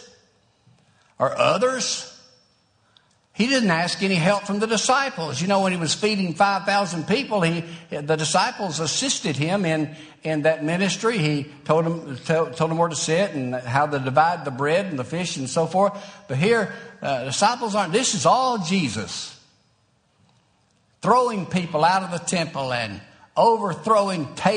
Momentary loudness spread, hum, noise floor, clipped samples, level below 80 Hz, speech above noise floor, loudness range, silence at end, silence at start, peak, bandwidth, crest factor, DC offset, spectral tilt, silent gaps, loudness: 9 LU; none; -64 dBFS; under 0.1%; -64 dBFS; 42 dB; 3 LU; 0 s; 0 s; -2 dBFS; 10 kHz; 20 dB; under 0.1%; -4 dB/octave; none; -22 LUFS